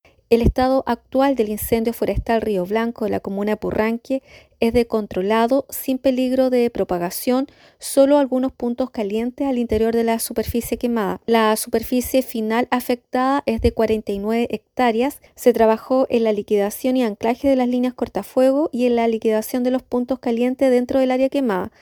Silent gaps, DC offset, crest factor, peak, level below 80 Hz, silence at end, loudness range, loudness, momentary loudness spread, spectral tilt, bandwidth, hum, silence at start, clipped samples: none; under 0.1%; 18 dB; -2 dBFS; -40 dBFS; 0.15 s; 2 LU; -20 LUFS; 6 LU; -5.5 dB/octave; over 20 kHz; none; 0.3 s; under 0.1%